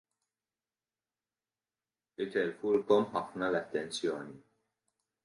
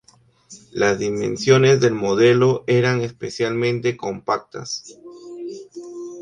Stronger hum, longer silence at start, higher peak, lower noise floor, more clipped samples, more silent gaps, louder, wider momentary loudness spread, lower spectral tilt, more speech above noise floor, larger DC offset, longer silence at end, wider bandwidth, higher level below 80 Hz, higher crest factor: neither; first, 2.2 s vs 0.5 s; second, -14 dBFS vs -2 dBFS; first, under -90 dBFS vs -52 dBFS; neither; neither; second, -33 LUFS vs -19 LUFS; second, 14 LU vs 19 LU; about the same, -5 dB/octave vs -5.5 dB/octave; first, over 58 dB vs 33 dB; neither; first, 0.85 s vs 0 s; first, 11.5 kHz vs 9.6 kHz; second, -76 dBFS vs -58 dBFS; about the same, 22 dB vs 18 dB